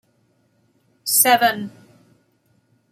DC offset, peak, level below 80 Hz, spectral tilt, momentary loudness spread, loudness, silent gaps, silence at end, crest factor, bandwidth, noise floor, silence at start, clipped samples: under 0.1%; 0 dBFS; -74 dBFS; -1 dB/octave; 18 LU; -17 LUFS; none; 1.25 s; 22 dB; 16 kHz; -63 dBFS; 1.05 s; under 0.1%